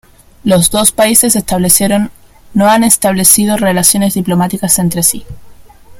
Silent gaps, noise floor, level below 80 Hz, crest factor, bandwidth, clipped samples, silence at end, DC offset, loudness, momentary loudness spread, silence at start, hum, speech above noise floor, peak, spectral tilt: none; -35 dBFS; -38 dBFS; 12 dB; over 20 kHz; 0.6%; 0 s; under 0.1%; -9 LUFS; 7 LU; 0.45 s; none; 25 dB; 0 dBFS; -3.5 dB/octave